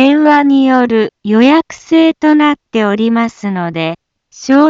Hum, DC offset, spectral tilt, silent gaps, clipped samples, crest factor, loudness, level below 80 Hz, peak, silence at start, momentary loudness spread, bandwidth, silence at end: none; under 0.1%; -6 dB/octave; none; under 0.1%; 10 dB; -11 LUFS; -56 dBFS; 0 dBFS; 0 s; 10 LU; 7.6 kHz; 0 s